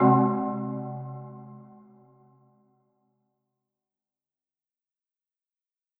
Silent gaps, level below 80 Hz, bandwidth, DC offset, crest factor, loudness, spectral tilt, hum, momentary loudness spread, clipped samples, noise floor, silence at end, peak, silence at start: none; -78 dBFS; 3 kHz; under 0.1%; 22 dB; -27 LUFS; -13.5 dB/octave; none; 25 LU; under 0.1%; -90 dBFS; 4.35 s; -8 dBFS; 0 s